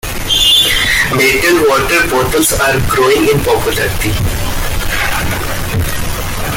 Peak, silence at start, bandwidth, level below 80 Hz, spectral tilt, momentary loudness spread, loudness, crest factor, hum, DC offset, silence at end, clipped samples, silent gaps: 0 dBFS; 0.05 s; 17 kHz; -22 dBFS; -3 dB/octave; 10 LU; -11 LUFS; 12 dB; none; under 0.1%; 0 s; under 0.1%; none